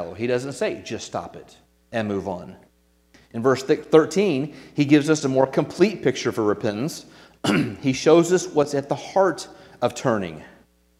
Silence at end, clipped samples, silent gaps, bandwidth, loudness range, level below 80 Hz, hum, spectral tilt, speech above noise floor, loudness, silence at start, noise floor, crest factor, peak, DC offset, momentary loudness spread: 0.5 s; under 0.1%; none; 14.5 kHz; 7 LU; -60 dBFS; none; -5.5 dB/octave; 37 dB; -22 LUFS; 0 s; -58 dBFS; 22 dB; 0 dBFS; under 0.1%; 15 LU